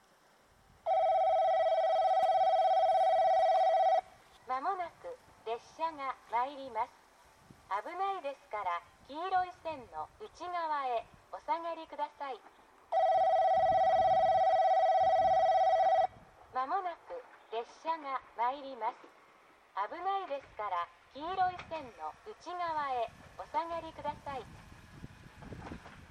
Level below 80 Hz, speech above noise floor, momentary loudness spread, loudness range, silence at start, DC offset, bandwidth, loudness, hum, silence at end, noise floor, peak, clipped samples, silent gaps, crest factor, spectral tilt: -66 dBFS; 28 dB; 19 LU; 11 LU; 0.85 s; under 0.1%; 9.6 kHz; -32 LUFS; none; 0.05 s; -65 dBFS; -20 dBFS; under 0.1%; none; 12 dB; -4.5 dB/octave